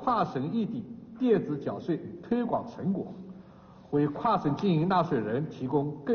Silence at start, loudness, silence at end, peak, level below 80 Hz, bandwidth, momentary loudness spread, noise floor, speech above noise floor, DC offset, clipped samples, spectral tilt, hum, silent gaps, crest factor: 0 s; -29 LUFS; 0 s; -12 dBFS; -62 dBFS; 6.6 kHz; 11 LU; -52 dBFS; 23 dB; under 0.1%; under 0.1%; -7 dB/octave; none; none; 16 dB